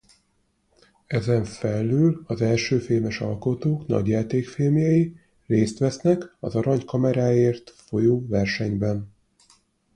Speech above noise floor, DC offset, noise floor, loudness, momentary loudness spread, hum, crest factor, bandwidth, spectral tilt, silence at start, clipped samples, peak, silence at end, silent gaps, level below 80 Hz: 46 dB; under 0.1%; -68 dBFS; -23 LUFS; 7 LU; none; 16 dB; 10.5 kHz; -7.5 dB/octave; 1.1 s; under 0.1%; -6 dBFS; 0.85 s; none; -52 dBFS